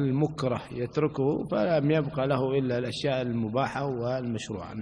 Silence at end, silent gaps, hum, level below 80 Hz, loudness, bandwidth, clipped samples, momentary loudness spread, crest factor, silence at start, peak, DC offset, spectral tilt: 0 s; none; none; -56 dBFS; -28 LUFS; 10.5 kHz; under 0.1%; 6 LU; 16 dB; 0 s; -12 dBFS; under 0.1%; -7 dB/octave